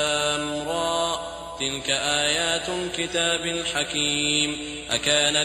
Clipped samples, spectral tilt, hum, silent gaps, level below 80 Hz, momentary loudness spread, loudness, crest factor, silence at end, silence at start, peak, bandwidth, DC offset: under 0.1%; -1.5 dB/octave; none; none; -50 dBFS; 7 LU; -23 LUFS; 18 dB; 0 s; 0 s; -8 dBFS; 16 kHz; under 0.1%